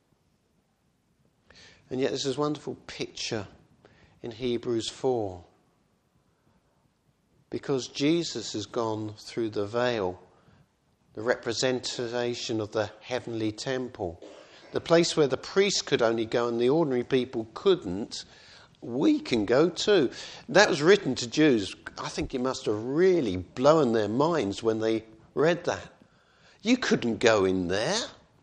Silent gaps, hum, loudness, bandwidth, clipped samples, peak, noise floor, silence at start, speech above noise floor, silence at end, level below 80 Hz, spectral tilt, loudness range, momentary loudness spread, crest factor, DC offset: none; none; -27 LUFS; 9.8 kHz; under 0.1%; -4 dBFS; -70 dBFS; 1.9 s; 44 dB; 0.3 s; -60 dBFS; -4.5 dB/octave; 9 LU; 14 LU; 24 dB; under 0.1%